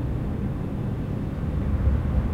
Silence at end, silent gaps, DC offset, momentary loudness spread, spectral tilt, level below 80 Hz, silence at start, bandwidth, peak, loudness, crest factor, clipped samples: 0 s; none; under 0.1%; 5 LU; -9.5 dB/octave; -28 dBFS; 0 s; 5.2 kHz; -10 dBFS; -27 LUFS; 14 dB; under 0.1%